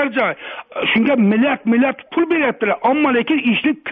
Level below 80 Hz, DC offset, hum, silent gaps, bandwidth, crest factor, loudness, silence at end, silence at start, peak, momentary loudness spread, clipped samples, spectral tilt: -58 dBFS; under 0.1%; none; none; 3.9 kHz; 12 dB; -16 LUFS; 0 s; 0 s; -4 dBFS; 6 LU; under 0.1%; -3.5 dB/octave